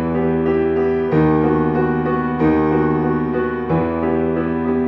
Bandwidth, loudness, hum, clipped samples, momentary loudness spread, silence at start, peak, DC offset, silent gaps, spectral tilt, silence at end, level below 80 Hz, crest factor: 5.6 kHz; -18 LUFS; none; under 0.1%; 4 LU; 0 s; -4 dBFS; under 0.1%; none; -10.5 dB/octave; 0 s; -38 dBFS; 12 dB